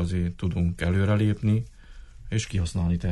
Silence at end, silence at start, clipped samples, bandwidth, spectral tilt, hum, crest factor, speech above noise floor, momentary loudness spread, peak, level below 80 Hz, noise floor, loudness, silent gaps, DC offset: 0 s; 0 s; under 0.1%; 11.5 kHz; -7 dB/octave; none; 12 dB; 20 dB; 6 LU; -12 dBFS; -38 dBFS; -44 dBFS; -26 LUFS; none; under 0.1%